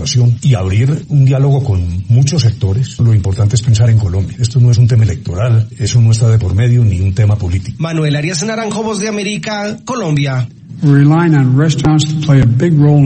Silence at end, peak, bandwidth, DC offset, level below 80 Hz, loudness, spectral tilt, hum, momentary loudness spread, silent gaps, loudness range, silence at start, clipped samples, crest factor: 0 s; 0 dBFS; 8.8 kHz; under 0.1%; -34 dBFS; -12 LUFS; -6.5 dB/octave; none; 8 LU; none; 4 LU; 0 s; 0.2%; 10 dB